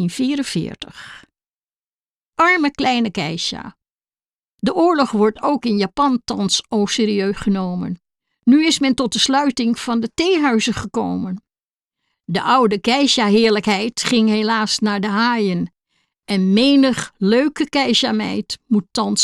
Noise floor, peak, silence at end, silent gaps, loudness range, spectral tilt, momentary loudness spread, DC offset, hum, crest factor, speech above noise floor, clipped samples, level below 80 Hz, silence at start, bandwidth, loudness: under -90 dBFS; -4 dBFS; 0 s; 1.55-1.68 s, 1.79-2.21 s, 2.27-2.33 s, 3.90-3.99 s, 4.26-4.32 s, 4.38-4.58 s, 11.64-11.68 s; 4 LU; -4 dB/octave; 10 LU; under 0.1%; none; 14 dB; over 73 dB; under 0.1%; -52 dBFS; 0 s; 12.5 kHz; -17 LUFS